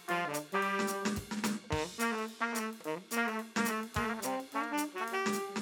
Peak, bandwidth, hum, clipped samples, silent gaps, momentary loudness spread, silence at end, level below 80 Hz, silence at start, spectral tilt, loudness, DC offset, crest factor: -18 dBFS; over 20 kHz; none; under 0.1%; none; 3 LU; 0 s; -60 dBFS; 0 s; -3.5 dB/octave; -35 LUFS; under 0.1%; 18 dB